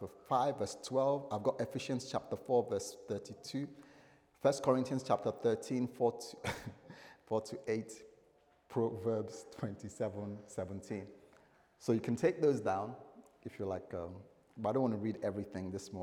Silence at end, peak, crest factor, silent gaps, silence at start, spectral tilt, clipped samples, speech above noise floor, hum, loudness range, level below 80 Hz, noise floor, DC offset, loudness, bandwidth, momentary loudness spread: 0 s; -16 dBFS; 22 dB; none; 0 s; -6 dB/octave; under 0.1%; 32 dB; none; 5 LU; -74 dBFS; -69 dBFS; under 0.1%; -37 LUFS; 16.5 kHz; 13 LU